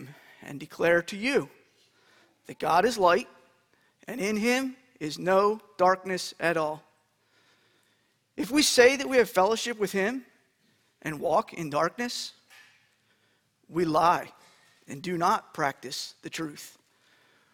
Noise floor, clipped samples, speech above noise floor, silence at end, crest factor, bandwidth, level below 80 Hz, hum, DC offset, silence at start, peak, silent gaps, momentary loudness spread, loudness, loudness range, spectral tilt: -70 dBFS; under 0.1%; 44 dB; 0.85 s; 22 dB; 19 kHz; -66 dBFS; none; under 0.1%; 0 s; -6 dBFS; none; 20 LU; -26 LUFS; 6 LU; -3.5 dB/octave